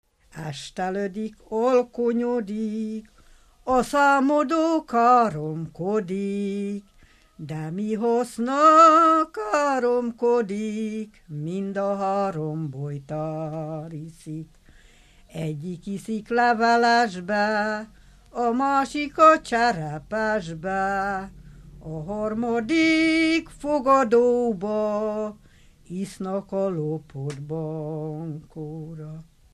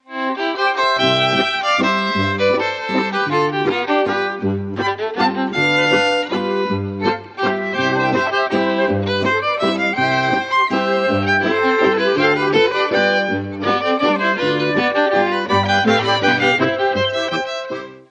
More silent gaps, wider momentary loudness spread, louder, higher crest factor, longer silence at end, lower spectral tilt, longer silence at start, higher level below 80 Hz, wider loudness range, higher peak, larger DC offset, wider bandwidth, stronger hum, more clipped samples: neither; first, 17 LU vs 6 LU; second, -23 LUFS vs -17 LUFS; about the same, 20 dB vs 16 dB; first, 0.3 s vs 0.1 s; about the same, -6 dB/octave vs -5 dB/octave; first, 0.35 s vs 0.1 s; second, -54 dBFS vs -48 dBFS; first, 11 LU vs 2 LU; about the same, -4 dBFS vs -2 dBFS; neither; first, 13 kHz vs 9.2 kHz; neither; neither